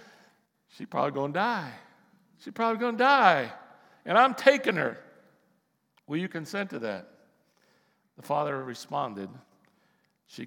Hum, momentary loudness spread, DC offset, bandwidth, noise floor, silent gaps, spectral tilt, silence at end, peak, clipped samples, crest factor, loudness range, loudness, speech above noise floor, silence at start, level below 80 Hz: none; 22 LU; under 0.1%; 18 kHz; -72 dBFS; none; -5 dB/octave; 0 s; -4 dBFS; under 0.1%; 26 dB; 12 LU; -27 LUFS; 45 dB; 0.8 s; under -90 dBFS